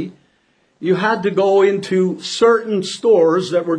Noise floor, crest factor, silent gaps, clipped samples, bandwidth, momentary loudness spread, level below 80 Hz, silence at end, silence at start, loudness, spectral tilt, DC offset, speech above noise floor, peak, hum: -60 dBFS; 14 dB; none; under 0.1%; 10 kHz; 7 LU; -64 dBFS; 0 s; 0 s; -16 LUFS; -5.5 dB/octave; under 0.1%; 45 dB; -2 dBFS; none